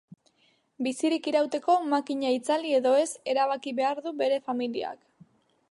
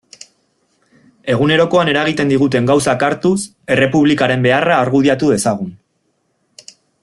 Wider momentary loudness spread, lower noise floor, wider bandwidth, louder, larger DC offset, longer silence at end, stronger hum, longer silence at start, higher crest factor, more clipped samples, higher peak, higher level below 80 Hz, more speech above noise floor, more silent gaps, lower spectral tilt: about the same, 8 LU vs 7 LU; about the same, -68 dBFS vs -65 dBFS; about the same, 11.5 kHz vs 12.5 kHz; second, -27 LUFS vs -14 LUFS; neither; second, 0.75 s vs 1.3 s; neither; second, 0.8 s vs 1.25 s; about the same, 16 dB vs 14 dB; neither; second, -12 dBFS vs 0 dBFS; second, -82 dBFS vs -52 dBFS; second, 41 dB vs 51 dB; neither; second, -3 dB/octave vs -5.5 dB/octave